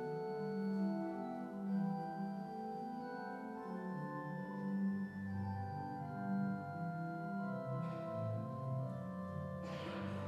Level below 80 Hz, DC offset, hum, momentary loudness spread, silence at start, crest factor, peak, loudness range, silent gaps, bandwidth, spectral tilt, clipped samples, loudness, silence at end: -78 dBFS; under 0.1%; none; 6 LU; 0 s; 12 dB; -30 dBFS; 2 LU; none; 7.8 kHz; -9 dB/octave; under 0.1%; -43 LUFS; 0 s